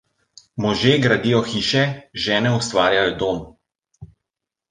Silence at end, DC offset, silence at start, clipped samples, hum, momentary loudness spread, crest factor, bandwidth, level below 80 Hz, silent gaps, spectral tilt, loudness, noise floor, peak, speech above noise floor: 0.65 s; under 0.1%; 0.55 s; under 0.1%; none; 8 LU; 18 dB; 9.8 kHz; -50 dBFS; none; -5 dB/octave; -19 LUFS; -84 dBFS; -2 dBFS; 65 dB